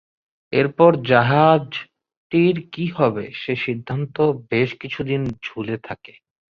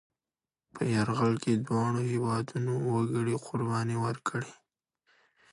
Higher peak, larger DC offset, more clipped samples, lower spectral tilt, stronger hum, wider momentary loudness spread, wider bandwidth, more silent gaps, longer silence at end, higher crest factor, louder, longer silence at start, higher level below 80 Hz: first, -2 dBFS vs -14 dBFS; neither; neither; first, -8.5 dB/octave vs -7 dB/octave; neither; first, 14 LU vs 6 LU; second, 6.6 kHz vs 11.5 kHz; first, 2.17-2.30 s vs none; second, 0.55 s vs 1 s; about the same, 18 dB vs 16 dB; first, -20 LUFS vs -30 LUFS; second, 0.5 s vs 0.75 s; first, -56 dBFS vs -66 dBFS